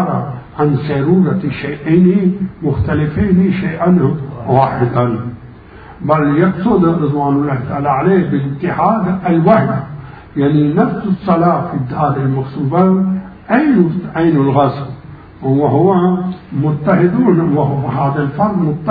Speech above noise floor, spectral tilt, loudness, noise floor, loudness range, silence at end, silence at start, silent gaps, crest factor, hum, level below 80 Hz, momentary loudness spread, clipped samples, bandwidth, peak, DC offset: 23 dB; -12 dB/octave; -14 LUFS; -35 dBFS; 1 LU; 0 s; 0 s; none; 14 dB; none; -40 dBFS; 9 LU; under 0.1%; 4.8 kHz; 0 dBFS; under 0.1%